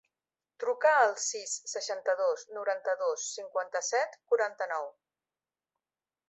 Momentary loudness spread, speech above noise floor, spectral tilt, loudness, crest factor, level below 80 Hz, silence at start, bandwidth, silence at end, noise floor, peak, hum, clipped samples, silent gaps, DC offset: 10 LU; over 59 dB; 2 dB/octave; -31 LUFS; 22 dB; under -90 dBFS; 0.6 s; 8.4 kHz; 1.4 s; under -90 dBFS; -12 dBFS; none; under 0.1%; none; under 0.1%